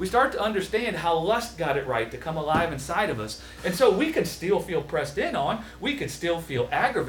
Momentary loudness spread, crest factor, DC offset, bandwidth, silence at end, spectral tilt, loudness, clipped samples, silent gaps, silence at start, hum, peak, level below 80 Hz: 7 LU; 18 dB; under 0.1%; over 20 kHz; 0 s; -4.5 dB/octave; -26 LUFS; under 0.1%; none; 0 s; none; -6 dBFS; -48 dBFS